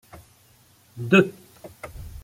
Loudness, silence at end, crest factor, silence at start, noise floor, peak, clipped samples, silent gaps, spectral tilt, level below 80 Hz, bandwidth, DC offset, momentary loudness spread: -20 LUFS; 0 s; 24 dB; 0.95 s; -57 dBFS; -2 dBFS; under 0.1%; none; -6.5 dB/octave; -50 dBFS; 16 kHz; under 0.1%; 22 LU